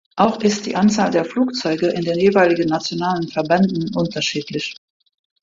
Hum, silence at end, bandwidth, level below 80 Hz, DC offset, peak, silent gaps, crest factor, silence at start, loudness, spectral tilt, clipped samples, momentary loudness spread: none; 0.7 s; 7.6 kHz; -56 dBFS; under 0.1%; -2 dBFS; none; 16 dB; 0.15 s; -18 LUFS; -5 dB/octave; under 0.1%; 7 LU